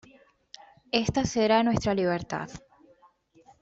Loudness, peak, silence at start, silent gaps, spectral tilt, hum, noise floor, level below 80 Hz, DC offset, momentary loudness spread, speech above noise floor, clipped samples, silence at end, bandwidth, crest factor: -26 LUFS; -6 dBFS; 0.95 s; none; -5 dB/octave; none; -61 dBFS; -52 dBFS; under 0.1%; 13 LU; 35 dB; under 0.1%; 1.05 s; 8 kHz; 22 dB